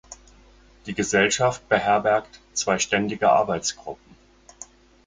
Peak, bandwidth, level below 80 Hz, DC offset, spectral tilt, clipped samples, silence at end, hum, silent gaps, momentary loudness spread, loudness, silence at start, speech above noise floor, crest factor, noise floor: -4 dBFS; 9.6 kHz; -54 dBFS; under 0.1%; -3 dB/octave; under 0.1%; 0.4 s; none; none; 22 LU; -22 LUFS; 0.1 s; 30 dB; 20 dB; -52 dBFS